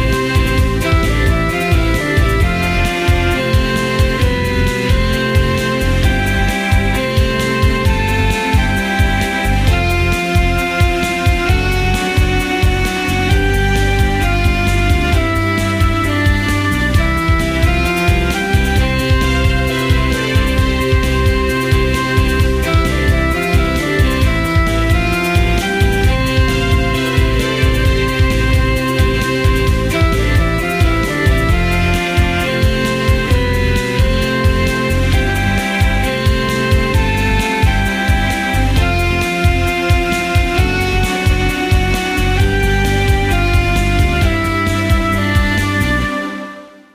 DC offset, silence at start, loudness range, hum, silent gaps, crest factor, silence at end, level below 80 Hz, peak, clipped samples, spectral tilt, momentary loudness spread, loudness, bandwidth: under 0.1%; 0 s; 0 LU; none; none; 14 dB; 0.25 s; -18 dBFS; 0 dBFS; under 0.1%; -5.5 dB/octave; 1 LU; -14 LUFS; 15.5 kHz